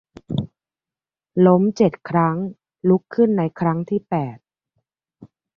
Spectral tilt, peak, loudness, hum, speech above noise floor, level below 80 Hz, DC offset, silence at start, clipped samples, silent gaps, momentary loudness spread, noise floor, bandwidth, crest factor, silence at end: -9 dB/octave; -2 dBFS; -20 LUFS; none; over 72 dB; -56 dBFS; under 0.1%; 0.3 s; under 0.1%; none; 13 LU; under -90 dBFS; 6.8 kHz; 18 dB; 0.3 s